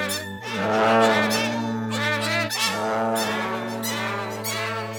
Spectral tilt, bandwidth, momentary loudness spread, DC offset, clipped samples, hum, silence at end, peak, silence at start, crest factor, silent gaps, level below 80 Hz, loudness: -3.5 dB/octave; over 20 kHz; 9 LU; under 0.1%; under 0.1%; none; 0 s; -6 dBFS; 0 s; 18 dB; none; -66 dBFS; -23 LUFS